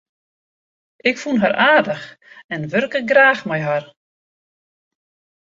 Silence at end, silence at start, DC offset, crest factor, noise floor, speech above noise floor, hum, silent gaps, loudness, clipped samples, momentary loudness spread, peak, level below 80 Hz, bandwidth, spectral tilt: 1.55 s; 1.05 s; under 0.1%; 18 dB; under -90 dBFS; over 73 dB; none; 2.44-2.49 s; -17 LUFS; under 0.1%; 15 LU; -2 dBFS; -64 dBFS; 7.6 kHz; -5.5 dB/octave